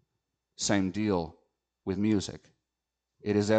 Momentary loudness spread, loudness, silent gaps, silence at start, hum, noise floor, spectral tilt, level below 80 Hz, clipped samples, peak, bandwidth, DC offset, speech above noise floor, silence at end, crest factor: 13 LU; -31 LUFS; none; 0.6 s; none; -87 dBFS; -5 dB/octave; -62 dBFS; under 0.1%; -12 dBFS; 9.2 kHz; under 0.1%; 59 dB; 0 s; 18 dB